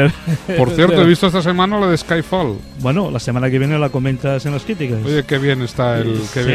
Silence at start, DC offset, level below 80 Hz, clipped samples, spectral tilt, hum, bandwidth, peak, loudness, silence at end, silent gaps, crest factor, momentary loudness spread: 0 s; under 0.1%; -40 dBFS; under 0.1%; -6.5 dB/octave; none; 14 kHz; 0 dBFS; -16 LUFS; 0 s; none; 16 dB; 8 LU